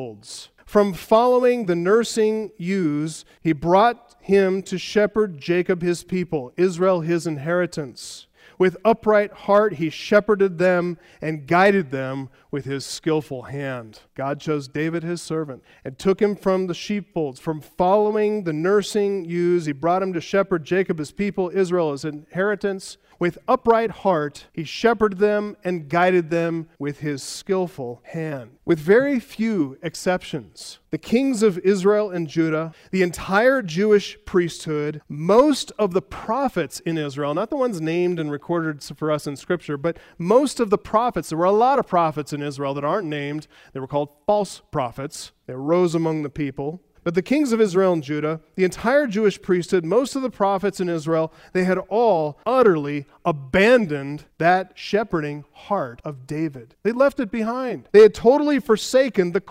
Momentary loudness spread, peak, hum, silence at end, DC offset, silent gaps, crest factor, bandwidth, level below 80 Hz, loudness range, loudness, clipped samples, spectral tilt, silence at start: 13 LU; -2 dBFS; none; 0 s; under 0.1%; none; 20 dB; 15.5 kHz; -54 dBFS; 5 LU; -21 LUFS; under 0.1%; -6 dB/octave; 0 s